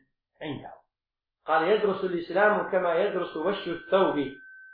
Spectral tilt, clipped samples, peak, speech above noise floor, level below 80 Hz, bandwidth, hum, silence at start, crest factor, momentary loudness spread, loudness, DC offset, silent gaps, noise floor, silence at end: -9 dB/octave; under 0.1%; -10 dBFS; 63 dB; -66 dBFS; 5 kHz; none; 0.4 s; 18 dB; 16 LU; -26 LUFS; under 0.1%; none; -89 dBFS; 0 s